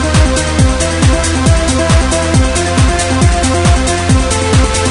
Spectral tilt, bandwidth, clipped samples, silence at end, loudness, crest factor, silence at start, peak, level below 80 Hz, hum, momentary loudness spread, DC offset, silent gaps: -4.5 dB/octave; 11 kHz; under 0.1%; 0 s; -11 LUFS; 10 dB; 0 s; 0 dBFS; -16 dBFS; none; 1 LU; under 0.1%; none